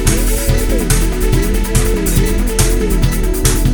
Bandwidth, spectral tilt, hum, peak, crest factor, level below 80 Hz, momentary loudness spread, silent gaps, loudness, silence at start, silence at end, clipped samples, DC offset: over 20 kHz; -4.5 dB/octave; none; 0 dBFS; 12 dB; -14 dBFS; 1 LU; none; -15 LUFS; 0 s; 0 s; under 0.1%; under 0.1%